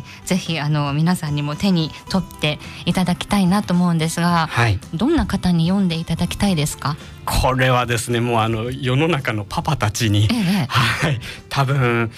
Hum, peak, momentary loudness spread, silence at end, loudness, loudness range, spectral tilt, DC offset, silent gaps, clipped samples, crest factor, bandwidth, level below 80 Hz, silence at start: none; -6 dBFS; 6 LU; 0 s; -19 LUFS; 1 LU; -5.5 dB/octave; under 0.1%; none; under 0.1%; 12 dB; 15.5 kHz; -36 dBFS; 0 s